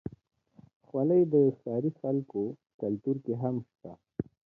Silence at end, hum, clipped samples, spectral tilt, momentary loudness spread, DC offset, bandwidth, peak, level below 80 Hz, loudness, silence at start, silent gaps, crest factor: 0.3 s; none; under 0.1%; -13 dB/octave; 17 LU; under 0.1%; 2.7 kHz; -14 dBFS; -66 dBFS; -30 LUFS; 0.05 s; 0.76-0.80 s, 2.74-2.79 s; 18 dB